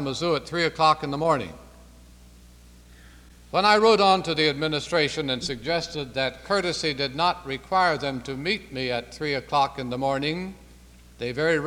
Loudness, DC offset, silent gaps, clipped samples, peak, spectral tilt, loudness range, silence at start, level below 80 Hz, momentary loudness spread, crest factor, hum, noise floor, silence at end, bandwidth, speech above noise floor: -24 LUFS; under 0.1%; none; under 0.1%; -4 dBFS; -4.5 dB/octave; 5 LU; 0 s; -50 dBFS; 10 LU; 20 dB; 60 Hz at -50 dBFS; -50 dBFS; 0 s; 15.5 kHz; 25 dB